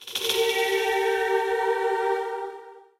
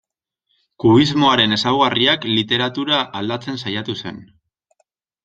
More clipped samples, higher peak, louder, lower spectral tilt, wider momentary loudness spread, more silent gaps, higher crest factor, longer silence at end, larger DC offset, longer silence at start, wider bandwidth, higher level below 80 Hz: neither; second, -6 dBFS vs -2 dBFS; second, -24 LUFS vs -17 LUFS; second, -0.5 dB/octave vs -5.5 dB/octave; about the same, 10 LU vs 11 LU; neither; about the same, 18 dB vs 18 dB; second, 0.2 s vs 1 s; neither; second, 0 s vs 0.8 s; first, 16 kHz vs 7.8 kHz; second, -66 dBFS vs -56 dBFS